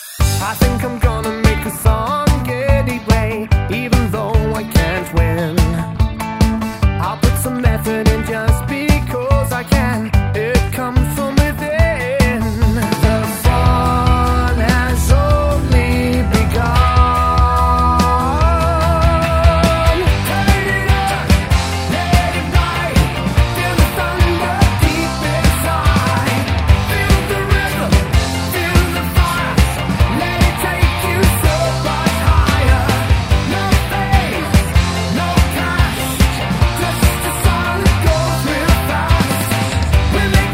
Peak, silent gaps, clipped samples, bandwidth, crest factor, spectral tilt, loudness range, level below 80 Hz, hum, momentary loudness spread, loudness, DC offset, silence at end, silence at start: 0 dBFS; none; under 0.1%; 16.5 kHz; 14 dB; -5.5 dB/octave; 3 LU; -18 dBFS; none; 3 LU; -15 LUFS; under 0.1%; 0 s; 0 s